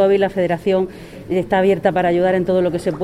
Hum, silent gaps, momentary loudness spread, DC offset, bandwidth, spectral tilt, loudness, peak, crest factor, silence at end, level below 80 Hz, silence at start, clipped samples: none; none; 7 LU; under 0.1%; 12.5 kHz; -7.5 dB/octave; -17 LUFS; -2 dBFS; 14 dB; 0 s; -46 dBFS; 0 s; under 0.1%